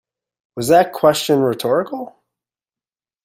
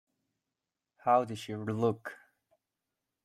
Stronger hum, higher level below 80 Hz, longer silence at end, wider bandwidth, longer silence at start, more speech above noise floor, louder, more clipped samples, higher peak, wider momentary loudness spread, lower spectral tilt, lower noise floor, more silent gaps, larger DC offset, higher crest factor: neither; first, -60 dBFS vs -76 dBFS; about the same, 1.15 s vs 1.1 s; first, 16 kHz vs 14.5 kHz; second, 0.55 s vs 1.05 s; first, over 74 dB vs 58 dB; first, -16 LUFS vs -32 LUFS; neither; first, 0 dBFS vs -14 dBFS; first, 17 LU vs 13 LU; second, -4.5 dB/octave vs -6.5 dB/octave; about the same, under -90 dBFS vs -89 dBFS; neither; neither; about the same, 18 dB vs 22 dB